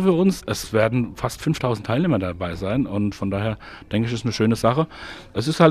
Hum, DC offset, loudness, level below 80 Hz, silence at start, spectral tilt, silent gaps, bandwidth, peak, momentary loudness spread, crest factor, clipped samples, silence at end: none; under 0.1%; -23 LUFS; -46 dBFS; 0 s; -6.5 dB/octave; none; 15 kHz; -2 dBFS; 8 LU; 20 dB; under 0.1%; 0 s